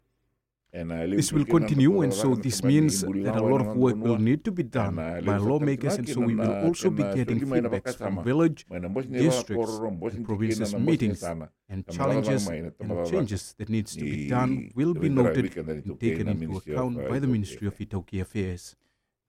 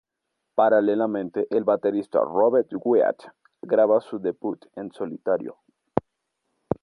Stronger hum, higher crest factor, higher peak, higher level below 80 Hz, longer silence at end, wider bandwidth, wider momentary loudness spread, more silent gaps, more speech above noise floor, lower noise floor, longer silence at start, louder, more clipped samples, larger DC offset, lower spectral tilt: neither; about the same, 18 dB vs 22 dB; second, -8 dBFS vs -2 dBFS; first, -52 dBFS vs -62 dBFS; first, 0.6 s vs 0.1 s; first, 16.5 kHz vs 5 kHz; about the same, 11 LU vs 13 LU; neither; second, 51 dB vs 58 dB; about the same, -77 dBFS vs -80 dBFS; first, 0.75 s vs 0.55 s; second, -26 LUFS vs -23 LUFS; neither; neither; second, -6.5 dB/octave vs -9 dB/octave